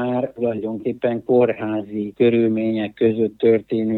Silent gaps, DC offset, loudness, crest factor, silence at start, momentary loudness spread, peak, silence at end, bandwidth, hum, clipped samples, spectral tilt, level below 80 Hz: none; under 0.1%; -20 LUFS; 14 dB; 0 s; 8 LU; -4 dBFS; 0 s; 4.2 kHz; none; under 0.1%; -9.5 dB/octave; -62 dBFS